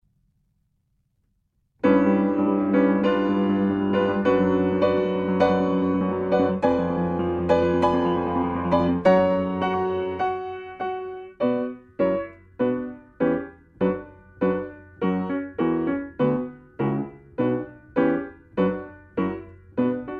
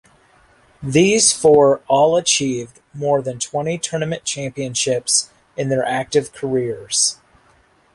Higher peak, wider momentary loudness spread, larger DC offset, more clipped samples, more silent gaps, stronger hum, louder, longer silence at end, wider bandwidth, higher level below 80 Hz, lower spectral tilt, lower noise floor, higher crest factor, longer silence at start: second, -6 dBFS vs 0 dBFS; about the same, 11 LU vs 12 LU; neither; neither; neither; neither; second, -23 LUFS vs -17 LUFS; second, 0 s vs 0.8 s; second, 7 kHz vs 11.5 kHz; about the same, -52 dBFS vs -56 dBFS; first, -9 dB/octave vs -3 dB/octave; first, -70 dBFS vs -55 dBFS; about the same, 18 dB vs 18 dB; first, 1.85 s vs 0.8 s